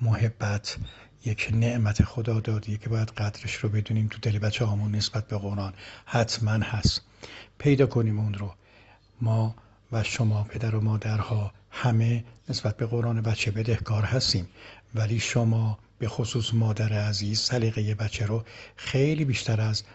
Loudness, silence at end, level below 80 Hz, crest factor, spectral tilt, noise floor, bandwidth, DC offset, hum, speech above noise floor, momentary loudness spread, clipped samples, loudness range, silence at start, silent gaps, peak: -27 LUFS; 0 s; -48 dBFS; 22 dB; -5.5 dB/octave; -56 dBFS; 8.2 kHz; under 0.1%; none; 29 dB; 9 LU; under 0.1%; 2 LU; 0 s; none; -4 dBFS